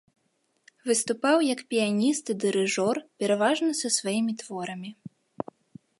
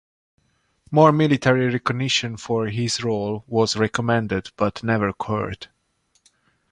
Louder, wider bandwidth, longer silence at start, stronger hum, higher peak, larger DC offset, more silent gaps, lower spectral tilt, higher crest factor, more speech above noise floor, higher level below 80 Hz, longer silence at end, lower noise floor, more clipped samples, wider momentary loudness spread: second, -26 LUFS vs -21 LUFS; about the same, 11.5 kHz vs 11 kHz; about the same, 0.85 s vs 0.9 s; neither; second, -8 dBFS vs -2 dBFS; neither; neither; second, -3.5 dB/octave vs -5.5 dB/octave; about the same, 18 dB vs 20 dB; about the same, 47 dB vs 46 dB; second, -76 dBFS vs -52 dBFS; about the same, 1.05 s vs 1.05 s; first, -73 dBFS vs -67 dBFS; neither; first, 15 LU vs 10 LU